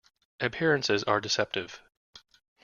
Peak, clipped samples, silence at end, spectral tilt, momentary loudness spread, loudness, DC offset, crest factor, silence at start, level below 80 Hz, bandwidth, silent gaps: -10 dBFS; under 0.1%; 0.45 s; -3.5 dB/octave; 13 LU; -28 LUFS; under 0.1%; 22 dB; 0.4 s; -66 dBFS; 7.2 kHz; 1.97-2.13 s